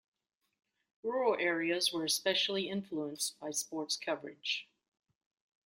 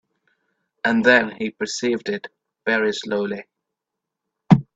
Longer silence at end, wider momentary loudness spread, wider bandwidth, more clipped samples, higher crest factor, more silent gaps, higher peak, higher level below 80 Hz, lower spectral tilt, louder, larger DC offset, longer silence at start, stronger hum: first, 1 s vs 0.15 s; second, 8 LU vs 14 LU; first, 16 kHz vs 8 kHz; neither; about the same, 20 dB vs 22 dB; neither; second, -18 dBFS vs 0 dBFS; second, -82 dBFS vs -58 dBFS; second, -2 dB/octave vs -5.5 dB/octave; second, -34 LUFS vs -21 LUFS; neither; first, 1.05 s vs 0.85 s; neither